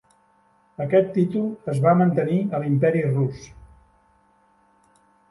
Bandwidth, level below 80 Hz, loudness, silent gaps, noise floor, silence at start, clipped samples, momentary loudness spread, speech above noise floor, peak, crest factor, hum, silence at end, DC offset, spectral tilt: 11.5 kHz; -58 dBFS; -21 LUFS; none; -61 dBFS; 0.8 s; under 0.1%; 8 LU; 40 dB; -6 dBFS; 18 dB; none; 1.85 s; under 0.1%; -9 dB/octave